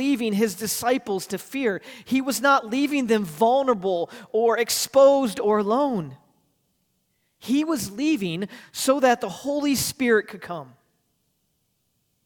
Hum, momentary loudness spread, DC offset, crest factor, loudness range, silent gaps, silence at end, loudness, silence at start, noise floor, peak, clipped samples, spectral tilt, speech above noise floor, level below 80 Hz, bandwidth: none; 11 LU; under 0.1%; 16 dB; 5 LU; none; 1.6 s; -23 LUFS; 0 s; -72 dBFS; -6 dBFS; under 0.1%; -4 dB/octave; 49 dB; -64 dBFS; 19 kHz